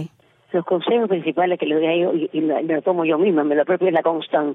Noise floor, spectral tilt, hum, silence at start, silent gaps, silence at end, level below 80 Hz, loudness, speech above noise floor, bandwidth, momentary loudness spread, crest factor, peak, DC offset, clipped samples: -42 dBFS; -9 dB/octave; none; 0 s; none; 0 s; -78 dBFS; -20 LUFS; 24 dB; 4 kHz; 4 LU; 14 dB; -6 dBFS; under 0.1%; under 0.1%